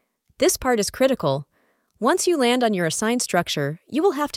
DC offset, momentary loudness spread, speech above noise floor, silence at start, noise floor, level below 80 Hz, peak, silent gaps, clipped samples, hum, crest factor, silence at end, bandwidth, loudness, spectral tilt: under 0.1%; 6 LU; 44 dB; 0.4 s; -65 dBFS; -52 dBFS; -4 dBFS; none; under 0.1%; none; 18 dB; 0 s; 16.5 kHz; -21 LUFS; -4 dB/octave